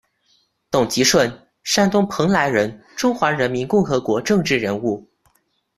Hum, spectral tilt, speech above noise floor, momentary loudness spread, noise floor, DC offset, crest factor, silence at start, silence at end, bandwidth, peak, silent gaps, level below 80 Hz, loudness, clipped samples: none; -4 dB/octave; 46 dB; 8 LU; -65 dBFS; under 0.1%; 18 dB; 0.7 s; 0.75 s; 14.5 kHz; -2 dBFS; none; -52 dBFS; -19 LUFS; under 0.1%